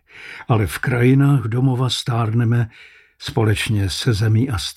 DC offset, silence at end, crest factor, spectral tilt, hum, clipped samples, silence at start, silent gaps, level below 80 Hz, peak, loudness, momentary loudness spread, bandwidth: under 0.1%; 0.05 s; 14 dB; -6 dB/octave; none; under 0.1%; 0.15 s; none; -42 dBFS; -4 dBFS; -18 LUFS; 10 LU; 14.5 kHz